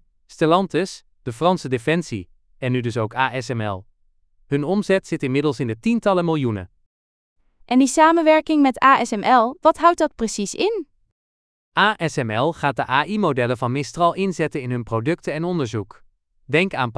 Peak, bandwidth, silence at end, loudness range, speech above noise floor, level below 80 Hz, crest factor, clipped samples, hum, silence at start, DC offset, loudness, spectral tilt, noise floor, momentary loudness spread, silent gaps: -2 dBFS; 11 kHz; 0.05 s; 7 LU; 40 dB; -54 dBFS; 20 dB; under 0.1%; none; 0.4 s; under 0.1%; -20 LUFS; -5.5 dB/octave; -60 dBFS; 11 LU; 6.86-7.36 s, 11.12-11.72 s